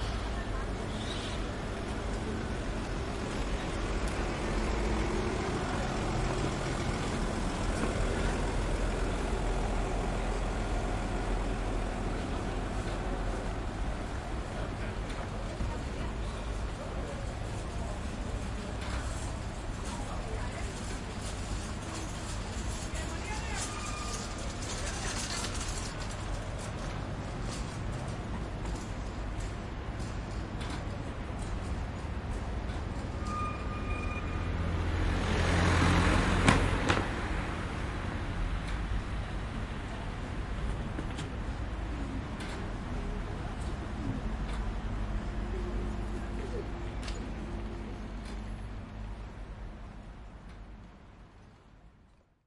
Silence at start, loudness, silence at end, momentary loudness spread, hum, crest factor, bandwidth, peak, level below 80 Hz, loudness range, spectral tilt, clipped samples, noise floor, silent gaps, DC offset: 0 s; -35 LUFS; 0.55 s; 7 LU; none; 28 dB; 11.5 kHz; -6 dBFS; -38 dBFS; 8 LU; -5 dB/octave; under 0.1%; -62 dBFS; none; under 0.1%